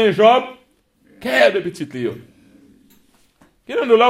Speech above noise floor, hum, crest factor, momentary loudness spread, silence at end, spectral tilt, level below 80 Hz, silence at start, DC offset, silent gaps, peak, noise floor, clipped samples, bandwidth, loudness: 42 dB; none; 18 dB; 16 LU; 0 s; -5 dB/octave; -64 dBFS; 0 s; under 0.1%; none; 0 dBFS; -58 dBFS; under 0.1%; 15.5 kHz; -17 LUFS